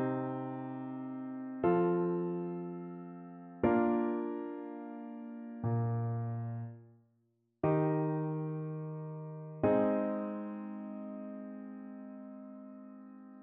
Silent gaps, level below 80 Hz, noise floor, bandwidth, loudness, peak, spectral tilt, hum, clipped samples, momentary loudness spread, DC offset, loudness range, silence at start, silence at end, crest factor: none; -70 dBFS; -76 dBFS; 3.8 kHz; -36 LUFS; -16 dBFS; -9.5 dB/octave; none; under 0.1%; 18 LU; under 0.1%; 5 LU; 0 s; 0 s; 20 dB